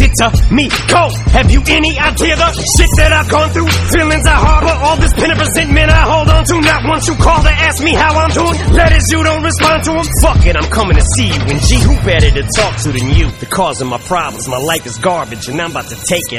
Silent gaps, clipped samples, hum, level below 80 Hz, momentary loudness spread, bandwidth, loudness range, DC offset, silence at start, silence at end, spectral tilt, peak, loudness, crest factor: none; 0.8%; none; -14 dBFS; 7 LU; 16 kHz; 4 LU; under 0.1%; 0 s; 0 s; -4.5 dB/octave; 0 dBFS; -11 LUFS; 10 dB